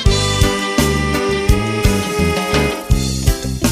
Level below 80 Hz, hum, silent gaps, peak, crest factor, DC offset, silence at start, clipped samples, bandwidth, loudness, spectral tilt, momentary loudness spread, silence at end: -20 dBFS; none; none; 0 dBFS; 14 dB; under 0.1%; 0 s; under 0.1%; 15.5 kHz; -16 LUFS; -4.5 dB/octave; 3 LU; 0 s